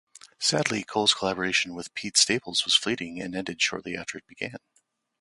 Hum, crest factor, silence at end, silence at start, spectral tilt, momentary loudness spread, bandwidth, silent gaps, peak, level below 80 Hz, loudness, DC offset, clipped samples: none; 22 dB; 0.65 s; 0.4 s; -1.5 dB/octave; 14 LU; 11.5 kHz; none; -6 dBFS; -64 dBFS; -25 LUFS; under 0.1%; under 0.1%